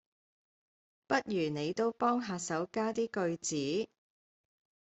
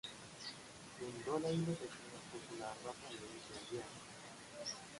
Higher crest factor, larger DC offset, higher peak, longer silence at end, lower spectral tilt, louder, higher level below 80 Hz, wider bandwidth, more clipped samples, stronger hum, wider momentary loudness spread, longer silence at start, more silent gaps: about the same, 20 dB vs 18 dB; neither; first, -16 dBFS vs -28 dBFS; first, 1.05 s vs 0 s; about the same, -4.5 dB/octave vs -4.5 dB/octave; first, -34 LUFS vs -46 LUFS; about the same, -76 dBFS vs -74 dBFS; second, 8.2 kHz vs 11.5 kHz; neither; neither; second, 4 LU vs 13 LU; first, 1.1 s vs 0.05 s; neither